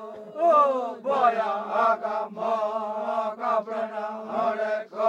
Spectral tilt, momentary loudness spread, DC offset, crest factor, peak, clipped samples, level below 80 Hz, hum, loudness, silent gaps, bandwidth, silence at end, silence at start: -5.5 dB/octave; 10 LU; under 0.1%; 16 dB; -8 dBFS; under 0.1%; -78 dBFS; none; -25 LUFS; none; 8.2 kHz; 0 s; 0 s